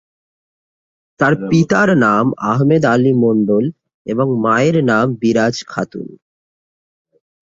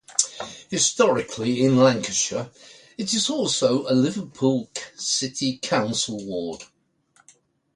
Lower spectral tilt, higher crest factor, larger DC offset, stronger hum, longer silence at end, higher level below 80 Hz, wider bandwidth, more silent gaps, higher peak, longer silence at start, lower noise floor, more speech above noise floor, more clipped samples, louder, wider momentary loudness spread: first, -7 dB/octave vs -3.5 dB/octave; second, 14 dB vs 22 dB; neither; neither; first, 1.3 s vs 1.1 s; first, -54 dBFS vs -64 dBFS; second, 7.8 kHz vs 11.5 kHz; first, 3.94-4.05 s vs none; about the same, -2 dBFS vs -2 dBFS; first, 1.2 s vs 0.1 s; first, under -90 dBFS vs -62 dBFS; first, over 76 dB vs 39 dB; neither; first, -14 LUFS vs -22 LUFS; about the same, 11 LU vs 13 LU